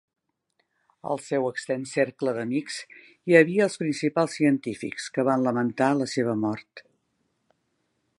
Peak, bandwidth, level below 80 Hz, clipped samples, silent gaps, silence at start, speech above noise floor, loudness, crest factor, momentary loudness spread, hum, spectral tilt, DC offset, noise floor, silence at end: -4 dBFS; 11.5 kHz; -72 dBFS; under 0.1%; none; 1.05 s; 50 dB; -25 LUFS; 24 dB; 14 LU; none; -5.5 dB/octave; under 0.1%; -74 dBFS; 1.4 s